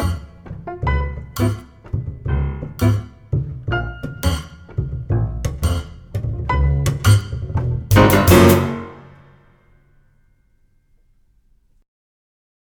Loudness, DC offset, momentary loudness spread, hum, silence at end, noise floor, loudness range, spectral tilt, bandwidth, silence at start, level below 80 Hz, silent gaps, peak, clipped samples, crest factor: -19 LUFS; under 0.1%; 17 LU; none; 3.65 s; -58 dBFS; 8 LU; -6 dB/octave; over 20 kHz; 0 s; -28 dBFS; none; 0 dBFS; under 0.1%; 20 dB